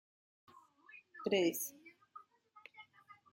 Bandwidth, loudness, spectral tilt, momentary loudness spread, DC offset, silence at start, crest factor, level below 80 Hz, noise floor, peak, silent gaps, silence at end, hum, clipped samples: 16.5 kHz; -37 LUFS; -3.5 dB/octave; 26 LU; under 0.1%; 0.55 s; 22 dB; -86 dBFS; -64 dBFS; -20 dBFS; none; 0.2 s; none; under 0.1%